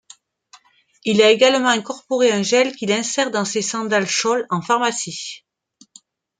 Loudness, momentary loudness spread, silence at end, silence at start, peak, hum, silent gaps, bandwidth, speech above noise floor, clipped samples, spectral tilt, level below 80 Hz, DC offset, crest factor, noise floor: -18 LUFS; 12 LU; 1.05 s; 1.05 s; -2 dBFS; none; none; 9.6 kHz; 37 dB; under 0.1%; -3 dB/octave; -68 dBFS; under 0.1%; 18 dB; -55 dBFS